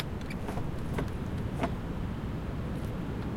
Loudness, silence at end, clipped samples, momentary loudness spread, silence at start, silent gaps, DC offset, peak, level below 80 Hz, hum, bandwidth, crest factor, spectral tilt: -36 LUFS; 0 s; under 0.1%; 3 LU; 0 s; none; under 0.1%; -16 dBFS; -40 dBFS; none; 16.5 kHz; 18 dB; -7.5 dB/octave